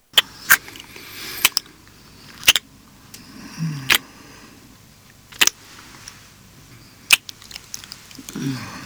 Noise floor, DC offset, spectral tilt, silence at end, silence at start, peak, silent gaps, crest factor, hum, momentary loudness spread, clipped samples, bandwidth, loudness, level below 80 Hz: -48 dBFS; under 0.1%; -0.5 dB/octave; 0 s; 0.15 s; -2 dBFS; none; 22 dB; none; 23 LU; under 0.1%; over 20 kHz; -18 LUFS; -54 dBFS